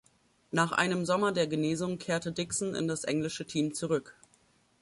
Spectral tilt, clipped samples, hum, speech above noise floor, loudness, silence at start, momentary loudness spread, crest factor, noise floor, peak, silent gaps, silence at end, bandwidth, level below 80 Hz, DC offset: -4.5 dB/octave; under 0.1%; none; 36 dB; -31 LUFS; 0.55 s; 5 LU; 20 dB; -67 dBFS; -12 dBFS; none; 0.7 s; 11.5 kHz; -68 dBFS; under 0.1%